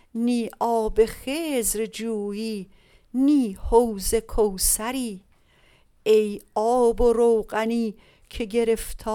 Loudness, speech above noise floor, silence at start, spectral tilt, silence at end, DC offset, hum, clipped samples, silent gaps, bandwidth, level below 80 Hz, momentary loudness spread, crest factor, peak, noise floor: -23 LUFS; 35 dB; 0.15 s; -4 dB/octave; 0 s; under 0.1%; none; under 0.1%; none; 18 kHz; -38 dBFS; 10 LU; 18 dB; -4 dBFS; -58 dBFS